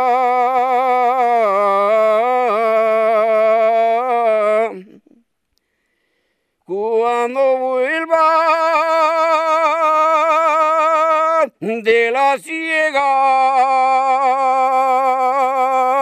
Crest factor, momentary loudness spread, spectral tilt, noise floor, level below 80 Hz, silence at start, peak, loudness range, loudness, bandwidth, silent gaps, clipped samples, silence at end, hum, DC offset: 14 dB; 4 LU; -3.5 dB/octave; -69 dBFS; -70 dBFS; 0 s; -2 dBFS; 6 LU; -15 LUFS; 12.5 kHz; none; under 0.1%; 0 s; none; under 0.1%